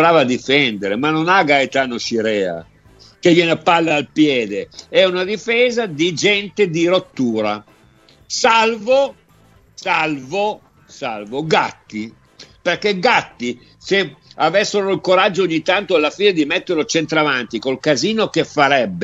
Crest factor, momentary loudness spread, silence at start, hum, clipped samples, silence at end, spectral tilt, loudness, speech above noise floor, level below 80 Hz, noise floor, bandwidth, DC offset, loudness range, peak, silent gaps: 18 dB; 11 LU; 0 s; none; under 0.1%; 0 s; -4 dB/octave; -16 LUFS; 34 dB; -58 dBFS; -51 dBFS; 8.2 kHz; under 0.1%; 4 LU; 0 dBFS; none